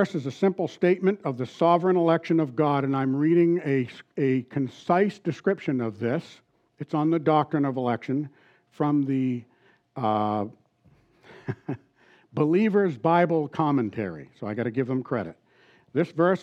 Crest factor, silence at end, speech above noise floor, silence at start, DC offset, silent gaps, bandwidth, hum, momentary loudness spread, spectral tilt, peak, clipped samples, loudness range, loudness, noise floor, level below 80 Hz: 16 dB; 0 s; 37 dB; 0 s; under 0.1%; none; 8 kHz; none; 13 LU; -8.5 dB/octave; -8 dBFS; under 0.1%; 6 LU; -25 LUFS; -61 dBFS; -78 dBFS